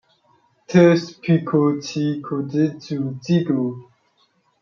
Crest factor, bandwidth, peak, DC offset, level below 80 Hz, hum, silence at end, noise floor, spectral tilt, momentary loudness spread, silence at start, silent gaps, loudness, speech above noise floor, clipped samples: 18 dB; 7.2 kHz; -2 dBFS; under 0.1%; -64 dBFS; none; 0.8 s; -63 dBFS; -7.5 dB/octave; 12 LU; 0.7 s; none; -20 LUFS; 44 dB; under 0.1%